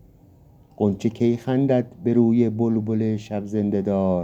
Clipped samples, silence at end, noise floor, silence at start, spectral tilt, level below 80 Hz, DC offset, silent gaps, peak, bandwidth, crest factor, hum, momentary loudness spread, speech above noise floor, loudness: under 0.1%; 0 s; -51 dBFS; 0.8 s; -9 dB/octave; -56 dBFS; under 0.1%; none; -6 dBFS; 7.8 kHz; 16 dB; none; 6 LU; 30 dB; -22 LUFS